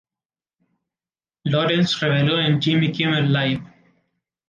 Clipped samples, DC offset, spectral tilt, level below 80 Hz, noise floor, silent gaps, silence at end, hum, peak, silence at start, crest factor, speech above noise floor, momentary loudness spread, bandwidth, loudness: under 0.1%; under 0.1%; -6.5 dB/octave; -60 dBFS; under -90 dBFS; none; 0.85 s; none; -8 dBFS; 1.45 s; 14 dB; over 71 dB; 6 LU; 7.6 kHz; -20 LUFS